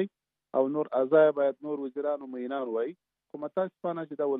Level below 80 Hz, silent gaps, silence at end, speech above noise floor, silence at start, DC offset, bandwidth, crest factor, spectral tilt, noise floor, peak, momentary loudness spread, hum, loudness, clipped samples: -88 dBFS; none; 0 s; 19 dB; 0 s; under 0.1%; 3.9 kHz; 18 dB; -6 dB/octave; -47 dBFS; -10 dBFS; 13 LU; none; -29 LUFS; under 0.1%